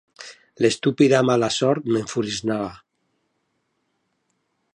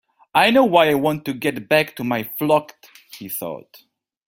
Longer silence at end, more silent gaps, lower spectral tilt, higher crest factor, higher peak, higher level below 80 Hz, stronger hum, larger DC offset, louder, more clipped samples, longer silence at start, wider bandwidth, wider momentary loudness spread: first, 2 s vs 0.7 s; neither; about the same, -5 dB/octave vs -5 dB/octave; about the same, 20 dB vs 20 dB; about the same, -2 dBFS vs 0 dBFS; about the same, -60 dBFS vs -60 dBFS; neither; neither; about the same, -21 LUFS vs -19 LUFS; neither; second, 0.2 s vs 0.35 s; second, 11 kHz vs 17 kHz; first, 19 LU vs 15 LU